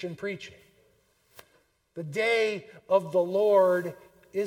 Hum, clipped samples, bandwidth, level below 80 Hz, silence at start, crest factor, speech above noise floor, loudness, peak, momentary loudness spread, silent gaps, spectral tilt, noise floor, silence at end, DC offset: none; under 0.1%; 16.5 kHz; -74 dBFS; 0 s; 18 dB; 41 dB; -26 LUFS; -10 dBFS; 19 LU; none; -5.5 dB/octave; -67 dBFS; 0 s; under 0.1%